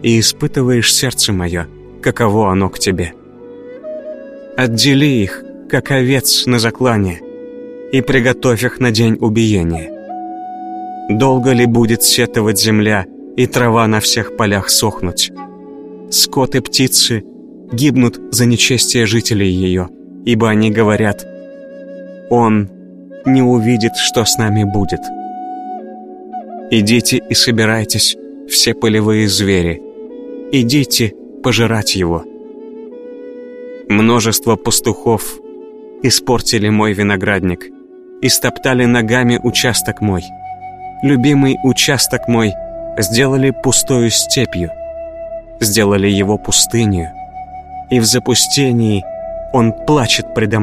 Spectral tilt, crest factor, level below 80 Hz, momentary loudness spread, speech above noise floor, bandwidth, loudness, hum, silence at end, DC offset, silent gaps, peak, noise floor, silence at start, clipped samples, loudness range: -4 dB/octave; 14 dB; -40 dBFS; 19 LU; 22 dB; 15.5 kHz; -13 LUFS; none; 0 s; under 0.1%; none; 0 dBFS; -34 dBFS; 0 s; under 0.1%; 3 LU